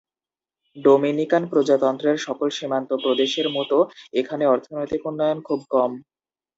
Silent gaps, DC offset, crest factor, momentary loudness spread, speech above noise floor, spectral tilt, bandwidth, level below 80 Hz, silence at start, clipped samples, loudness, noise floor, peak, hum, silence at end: none; under 0.1%; 18 dB; 8 LU; over 69 dB; -5 dB/octave; 7.8 kHz; -66 dBFS; 0.75 s; under 0.1%; -22 LUFS; under -90 dBFS; -4 dBFS; none; 0.55 s